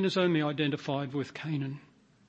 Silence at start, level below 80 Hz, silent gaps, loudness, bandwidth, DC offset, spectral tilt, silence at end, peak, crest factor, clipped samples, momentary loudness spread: 0 s; -74 dBFS; none; -31 LUFS; 8.6 kHz; under 0.1%; -6.5 dB/octave; 0.5 s; -14 dBFS; 18 dB; under 0.1%; 10 LU